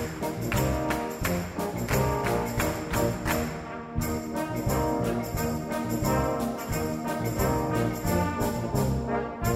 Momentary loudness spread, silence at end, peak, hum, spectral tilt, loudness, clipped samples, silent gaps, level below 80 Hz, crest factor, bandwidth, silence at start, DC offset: 5 LU; 0 s; -12 dBFS; none; -5.5 dB/octave; -28 LUFS; under 0.1%; none; -40 dBFS; 16 dB; 16 kHz; 0 s; under 0.1%